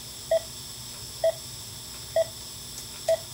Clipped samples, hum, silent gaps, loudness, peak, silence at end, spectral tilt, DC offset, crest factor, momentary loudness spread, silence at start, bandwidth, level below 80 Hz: under 0.1%; none; none; -31 LUFS; -14 dBFS; 0 s; -2.5 dB/octave; under 0.1%; 18 dB; 9 LU; 0 s; 16 kHz; -54 dBFS